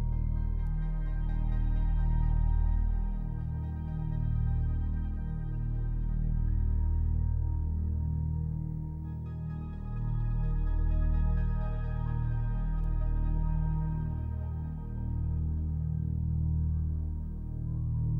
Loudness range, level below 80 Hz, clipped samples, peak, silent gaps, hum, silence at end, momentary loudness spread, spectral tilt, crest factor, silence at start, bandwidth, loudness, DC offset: 2 LU; -32 dBFS; under 0.1%; -20 dBFS; none; none; 0 s; 6 LU; -11.5 dB/octave; 10 dB; 0 s; 2.6 kHz; -33 LUFS; under 0.1%